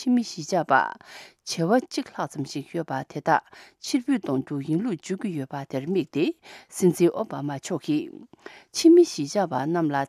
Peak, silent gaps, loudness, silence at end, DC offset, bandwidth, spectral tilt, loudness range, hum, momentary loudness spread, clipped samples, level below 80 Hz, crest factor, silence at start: -6 dBFS; none; -25 LUFS; 0 s; under 0.1%; 14 kHz; -5.5 dB/octave; 5 LU; none; 12 LU; under 0.1%; -74 dBFS; 20 dB; 0 s